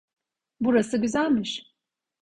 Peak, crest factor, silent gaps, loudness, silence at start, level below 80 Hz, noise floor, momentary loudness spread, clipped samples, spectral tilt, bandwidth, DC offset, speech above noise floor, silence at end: -10 dBFS; 18 dB; none; -25 LUFS; 0.6 s; -60 dBFS; -80 dBFS; 9 LU; under 0.1%; -5 dB/octave; 10.5 kHz; under 0.1%; 56 dB; 0.6 s